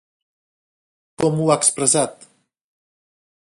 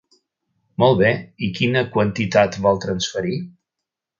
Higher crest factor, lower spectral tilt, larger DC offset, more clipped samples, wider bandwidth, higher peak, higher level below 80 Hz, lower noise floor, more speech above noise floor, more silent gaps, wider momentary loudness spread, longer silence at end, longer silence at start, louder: about the same, 22 dB vs 20 dB; second, -4 dB/octave vs -5.5 dB/octave; neither; neither; first, 11.5 kHz vs 7.6 kHz; about the same, 0 dBFS vs 0 dBFS; second, -62 dBFS vs -50 dBFS; first, under -90 dBFS vs -83 dBFS; first, over 72 dB vs 65 dB; neither; second, 7 LU vs 11 LU; first, 1.45 s vs 0.7 s; first, 1.2 s vs 0.8 s; about the same, -18 LUFS vs -19 LUFS